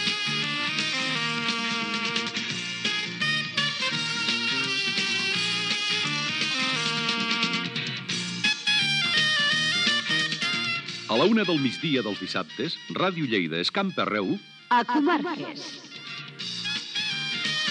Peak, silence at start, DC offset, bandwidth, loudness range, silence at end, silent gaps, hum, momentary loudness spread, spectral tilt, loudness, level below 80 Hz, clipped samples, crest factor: -8 dBFS; 0 s; under 0.1%; 11.5 kHz; 4 LU; 0 s; none; none; 9 LU; -3 dB/octave; -25 LUFS; -82 dBFS; under 0.1%; 18 dB